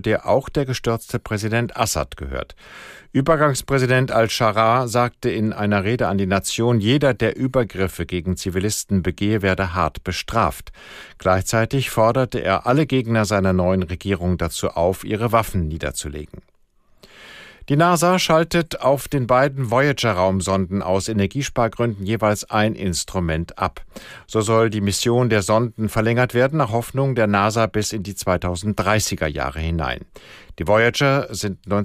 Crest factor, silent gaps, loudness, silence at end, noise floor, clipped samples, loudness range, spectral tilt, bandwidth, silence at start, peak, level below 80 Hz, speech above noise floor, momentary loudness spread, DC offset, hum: 16 dB; none; -20 LUFS; 0 s; -56 dBFS; under 0.1%; 4 LU; -5 dB/octave; 15.5 kHz; 0.05 s; -4 dBFS; -42 dBFS; 37 dB; 9 LU; under 0.1%; none